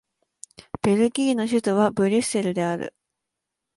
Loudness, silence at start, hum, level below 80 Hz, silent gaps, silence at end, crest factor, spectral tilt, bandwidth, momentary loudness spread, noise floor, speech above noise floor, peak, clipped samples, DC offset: -22 LUFS; 0.85 s; none; -60 dBFS; none; 0.9 s; 16 dB; -5.5 dB/octave; 11.5 kHz; 9 LU; -83 dBFS; 62 dB; -8 dBFS; under 0.1%; under 0.1%